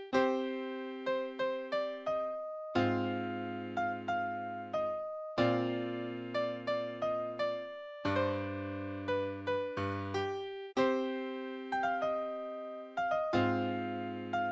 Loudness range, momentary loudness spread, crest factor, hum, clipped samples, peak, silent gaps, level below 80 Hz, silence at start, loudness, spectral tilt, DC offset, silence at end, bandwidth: 1 LU; 8 LU; 20 dB; none; under 0.1%; -14 dBFS; none; -64 dBFS; 0 s; -36 LUFS; -7 dB/octave; under 0.1%; 0 s; 8 kHz